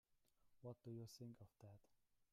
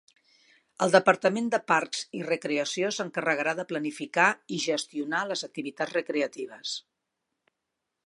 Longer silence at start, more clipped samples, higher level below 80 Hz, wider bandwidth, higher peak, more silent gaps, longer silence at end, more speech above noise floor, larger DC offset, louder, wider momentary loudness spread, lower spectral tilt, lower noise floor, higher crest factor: second, 0.1 s vs 0.8 s; neither; about the same, -86 dBFS vs -82 dBFS; first, 15 kHz vs 11.5 kHz; second, -44 dBFS vs -4 dBFS; neither; second, 0.1 s vs 1.25 s; second, 21 dB vs 56 dB; neither; second, -60 LUFS vs -27 LUFS; about the same, 10 LU vs 10 LU; first, -6.5 dB/octave vs -3.5 dB/octave; second, -80 dBFS vs -84 dBFS; second, 16 dB vs 26 dB